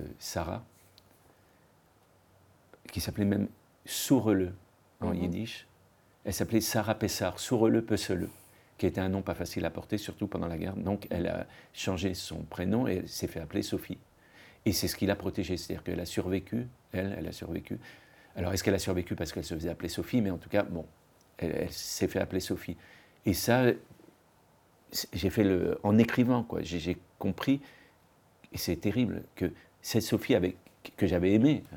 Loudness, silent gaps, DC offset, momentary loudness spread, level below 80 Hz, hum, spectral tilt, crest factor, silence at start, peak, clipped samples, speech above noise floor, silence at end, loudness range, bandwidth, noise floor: -31 LUFS; none; under 0.1%; 12 LU; -58 dBFS; none; -5.5 dB/octave; 22 dB; 0 s; -10 dBFS; under 0.1%; 33 dB; 0 s; 5 LU; 19 kHz; -64 dBFS